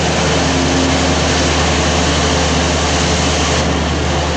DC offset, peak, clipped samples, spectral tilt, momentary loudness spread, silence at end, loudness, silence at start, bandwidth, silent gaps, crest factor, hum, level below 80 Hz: under 0.1%; -2 dBFS; under 0.1%; -4 dB/octave; 2 LU; 0 s; -13 LUFS; 0 s; 9.8 kHz; none; 12 dB; none; -24 dBFS